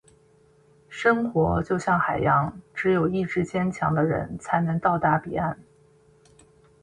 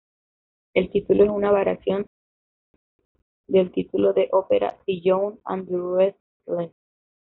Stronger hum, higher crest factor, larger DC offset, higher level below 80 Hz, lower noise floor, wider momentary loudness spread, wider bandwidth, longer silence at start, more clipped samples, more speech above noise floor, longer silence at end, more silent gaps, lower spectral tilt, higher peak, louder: neither; about the same, 18 dB vs 18 dB; neither; first, -48 dBFS vs -56 dBFS; second, -58 dBFS vs under -90 dBFS; second, 7 LU vs 11 LU; first, 10.5 kHz vs 4.1 kHz; first, 0.9 s vs 0.75 s; neither; second, 35 dB vs over 69 dB; first, 1.2 s vs 0.6 s; second, none vs 2.07-2.99 s, 3.05-3.15 s, 3.22-3.44 s, 6.20-6.40 s; first, -7.5 dB/octave vs -6 dB/octave; about the same, -6 dBFS vs -6 dBFS; about the same, -24 LUFS vs -22 LUFS